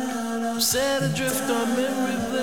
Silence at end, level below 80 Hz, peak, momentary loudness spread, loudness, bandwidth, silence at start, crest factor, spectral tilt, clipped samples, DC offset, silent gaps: 0 s; -54 dBFS; -8 dBFS; 6 LU; -24 LUFS; over 20 kHz; 0 s; 16 dB; -3.5 dB/octave; under 0.1%; 0.4%; none